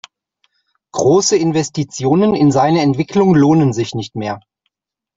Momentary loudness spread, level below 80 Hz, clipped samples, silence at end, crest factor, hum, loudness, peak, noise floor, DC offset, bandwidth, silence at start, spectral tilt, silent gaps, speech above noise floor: 12 LU; -52 dBFS; under 0.1%; 0.8 s; 14 dB; none; -14 LUFS; -2 dBFS; -72 dBFS; under 0.1%; 7.8 kHz; 0.95 s; -6 dB/octave; none; 59 dB